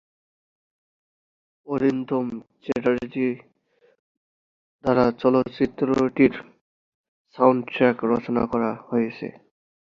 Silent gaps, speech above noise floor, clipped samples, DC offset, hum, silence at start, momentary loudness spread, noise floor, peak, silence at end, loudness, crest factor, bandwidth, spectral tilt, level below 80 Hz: 3.99-4.79 s, 6.61-7.25 s; 41 dB; under 0.1%; under 0.1%; none; 1.65 s; 11 LU; -63 dBFS; -2 dBFS; 0.5 s; -23 LUFS; 22 dB; 7.2 kHz; -8 dB/octave; -58 dBFS